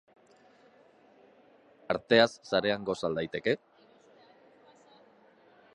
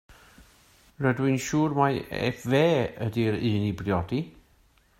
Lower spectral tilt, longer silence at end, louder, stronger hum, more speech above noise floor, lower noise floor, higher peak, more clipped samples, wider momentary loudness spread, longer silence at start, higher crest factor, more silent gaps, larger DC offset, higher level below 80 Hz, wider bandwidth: second, -5 dB/octave vs -6.5 dB/octave; first, 2.2 s vs 0.7 s; second, -29 LUFS vs -26 LUFS; neither; about the same, 33 dB vs 36 dB; about the same, -61 dBFS vs -62 dBFS; about the same, -8 dBFS vs -8 dBFS; neither; first, 11 LU vs 7 LU; first, 1.9 s vs 0.1 s; first, 26 dB vs 20 dB; neither; neither; second, -68 dBFS vs -54 dBFS; second, 10.5 kHz vs 16 kHz